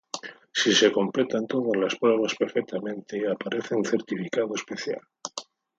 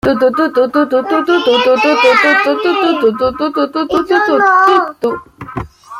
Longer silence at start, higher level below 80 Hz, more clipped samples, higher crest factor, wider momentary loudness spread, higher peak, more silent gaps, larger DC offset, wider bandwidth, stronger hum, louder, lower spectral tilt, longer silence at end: about the same, 0.15 s vs 0.05 s; second, -74 dBFS vs -44 dBFS; neither; first, 20 dB vs 10 dB; first, 15 LU vs 11 LU; second, -6 dBFS vs 0 dBFS; neither; neither; second, 9 kHz vs 15 kHz; neither; second, -26 LUFS vs -11 LUFS; second, -3.5 dB/octave vs -5 dB/octave; first, 0.35 s vs 0 s